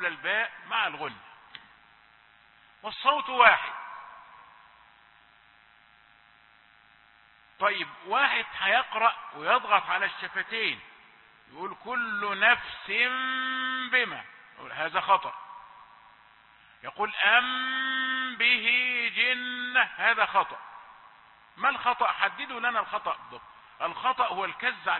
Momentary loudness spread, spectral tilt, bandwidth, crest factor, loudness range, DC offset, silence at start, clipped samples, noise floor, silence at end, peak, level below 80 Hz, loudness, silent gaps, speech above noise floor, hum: 19 LU; -5.5 dB/octave; 4.3 kHz; 26 dB; 6 LU; under 0.1%; 0 s; under 0.1%; -59 dBFS; 0 s; -4 dBFS; -72 dBFS; -26 LUFS; none; 32 dB; none